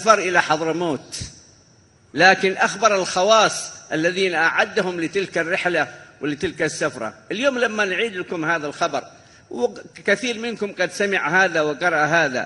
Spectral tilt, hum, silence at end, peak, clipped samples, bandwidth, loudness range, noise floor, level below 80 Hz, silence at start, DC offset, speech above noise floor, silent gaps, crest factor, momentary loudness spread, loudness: -3 dB/octave; none; 0 s; 0 dBFS; under 0.1%; 12 kHz; 5 LU; -54 dBFS; -58 dBFS; 0 s; under 0.1%; 33 dB; none; 20 dB; 12 LU; -20 LUFS